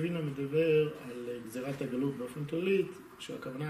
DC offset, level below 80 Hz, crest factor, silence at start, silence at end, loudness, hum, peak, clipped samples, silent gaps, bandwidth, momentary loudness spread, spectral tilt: under 0.1%; -70 dBFS; 16 dB; 0 s; 0 s; -34 LUFS; none; -18 dBFS; under 0.1%; none; 15 kHz; 13 LU; -7 dB/octave